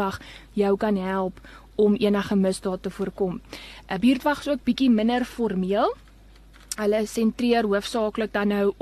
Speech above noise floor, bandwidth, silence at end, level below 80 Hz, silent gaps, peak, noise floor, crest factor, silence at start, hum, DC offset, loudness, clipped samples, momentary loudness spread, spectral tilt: 26 dB; 13 kHz; 0.1 s; -50 dBFS; none; -10 dBFS; -49 dBFS; 14 dB; 0 s; none; under 0.1%; -24 LUFS; under 0.1%; 12 LU; -6 dB/octave